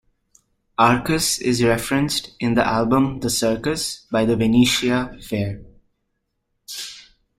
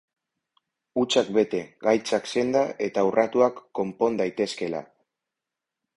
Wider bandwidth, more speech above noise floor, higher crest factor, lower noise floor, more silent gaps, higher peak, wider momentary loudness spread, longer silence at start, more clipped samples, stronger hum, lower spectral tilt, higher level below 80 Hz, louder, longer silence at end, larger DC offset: first, 16 kHz vs 11.5 kHz; second, 54 dB vs 63 dB; about the same, 20 dB vs 20 dB; second, -74 dBFS vs -87 dBFS; neither; first, -2 dBFS vs -6 dBFS; first, 14 LU vs 9 LU; second, 0.8 s vs 0.95 s; neither; neither; about the same, -4.5 dB/octave vs -4.5 dB/octave; first, -44 dBFS vs -66 dBFS; first, -20 LUFS vs -25 LUFS; second, 0.35 s vs 1.1 s; neither